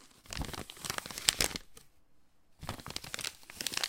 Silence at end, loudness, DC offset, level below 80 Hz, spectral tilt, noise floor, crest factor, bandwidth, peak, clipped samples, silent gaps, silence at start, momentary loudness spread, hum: 0 s; -36 LUFS; under 0.1%; -54 dBFS; -1 dB/octave; -61 dBFS; 38 dB; 17 kHz; -2 dBFS; under 0.1%; none; 0 s; 15 LU; none